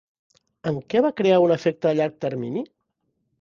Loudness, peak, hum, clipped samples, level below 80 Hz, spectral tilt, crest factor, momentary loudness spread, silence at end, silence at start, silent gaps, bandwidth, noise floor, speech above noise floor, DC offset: -22 LUFS; -6 dBFS; none; under 0.1%; -66 dBFS; -7.5 dB/octave; 18 dB; 13 LU; 0.75 s; 0.65 s; none; 7.2 kHz; -74 dBFS; 53 dB; under 0.1%